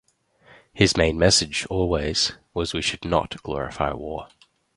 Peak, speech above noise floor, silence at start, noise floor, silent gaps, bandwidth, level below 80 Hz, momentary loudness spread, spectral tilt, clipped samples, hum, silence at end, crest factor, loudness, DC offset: -4 dBFS; 33 dB; 0.75 s; -56 dBFS; none; 11.5 kHz; -40 dBFS; 12 LU; -3.5 dB/octave; under 0.1%; none; 0.5 s; 22 dB; -22 LUFS; under 0.1%